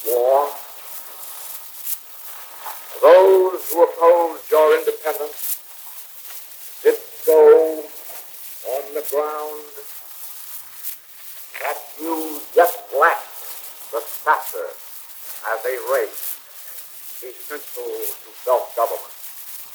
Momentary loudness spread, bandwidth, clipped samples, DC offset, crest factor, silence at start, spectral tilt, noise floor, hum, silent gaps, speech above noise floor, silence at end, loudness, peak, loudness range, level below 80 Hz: 18 LU; over 20 kHz; under 0.1%; under 0.1%; 20 dB; 0 s; -1 dB/octave; -38 dBFS; none; none; 18 dB; 0 s; -19 LUFS; 0 dBFS; 12 LU; under -90 dBFS